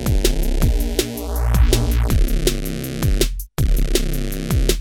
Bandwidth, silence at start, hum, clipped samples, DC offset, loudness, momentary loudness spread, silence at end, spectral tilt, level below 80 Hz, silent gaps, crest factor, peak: 19 kHz; 0 s; none; under 0.1%; under 0.1%; -21 LUFS; 7 LU; 0 s; -5 dB/octave; -18 dBFS; none; 16 dB; 0 dBFS